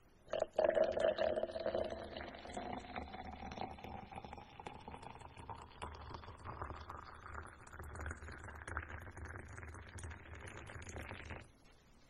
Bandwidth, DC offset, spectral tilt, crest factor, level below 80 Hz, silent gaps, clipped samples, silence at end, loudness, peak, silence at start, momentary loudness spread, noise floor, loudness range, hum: 11.5 kHz; under 0.1%; -5.5 dB/octave; 24 dB; -58 dBFS; none; under 0.1%; 0 s; -44 LUFS; -20 dBFS; 0.05 s; 17 LU; -65 dBFS; 12 LU; none